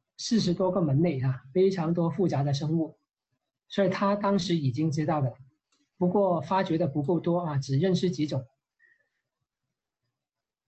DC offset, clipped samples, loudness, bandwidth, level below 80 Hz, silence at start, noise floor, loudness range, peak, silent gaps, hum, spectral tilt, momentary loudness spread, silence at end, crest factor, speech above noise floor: under 0.1%; under 0.1%; -27 LUFS; 8.4 kHz; -62 dBFS; 0.2 s; -90 dBFS; 3 LU; -14 dBFS; none; none; -7 dB/octave; 5 LU; 2.25 s; 14 dB; 64 dB